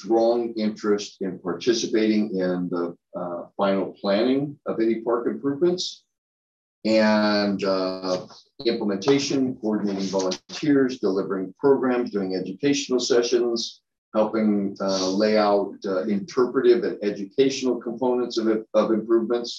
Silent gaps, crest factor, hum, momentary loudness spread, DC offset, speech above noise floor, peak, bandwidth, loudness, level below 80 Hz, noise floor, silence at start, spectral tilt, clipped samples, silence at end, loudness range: 6.18-6.82 s, 13.98-14.12 s; 16 dB; none; 8 LU; under 0.1%; over 67 dB; -8 dBFS; 7.8 kHz; -23 LUFS; -68 dBFS; under -90 dBFS; 0 s; -5 dB/octave; under 0.1%; 0 s; 2 LU